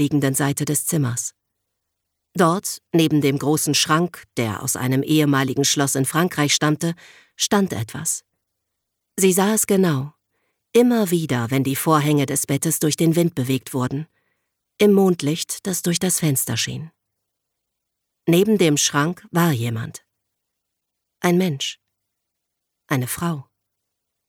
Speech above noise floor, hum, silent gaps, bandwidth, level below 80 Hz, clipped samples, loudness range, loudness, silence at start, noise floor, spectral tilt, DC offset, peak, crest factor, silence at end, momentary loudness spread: 60 dB; none; none; 18.5 kHz; -62 dBFS; under 0.1%; 5 LU; -20 LUFS; 0 s; -79 dBFS; -4.5 dB/octave; under 0.1%; -4 dBFS; 18 dB; 0.85 s; 10 LU